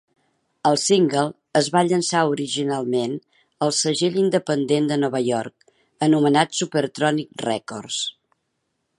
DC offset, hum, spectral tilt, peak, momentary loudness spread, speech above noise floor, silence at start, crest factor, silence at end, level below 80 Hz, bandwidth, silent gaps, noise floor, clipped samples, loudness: under 0.1%; none; -4.5 dB/octave; -2 dBFS; 9 LU; 54 dB; 0.65 s; 20 dB; 0.9 s; -70 dBFS; 11.5 kHz; none; -74 dBFS; under 0.1%; -21 LUFS